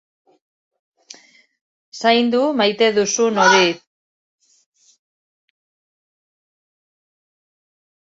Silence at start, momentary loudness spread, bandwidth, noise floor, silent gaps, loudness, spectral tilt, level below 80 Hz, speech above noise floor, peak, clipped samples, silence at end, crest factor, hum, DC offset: 1.95 s; 8 LU; 8 kHz; -51 dBFS; none; -16 LUFS; -2.5 dB/octave; -68 dBFS; 35 dB; 0 dBFS; under 0.1%; 4.35 s; 22 dB; none; under 0.1%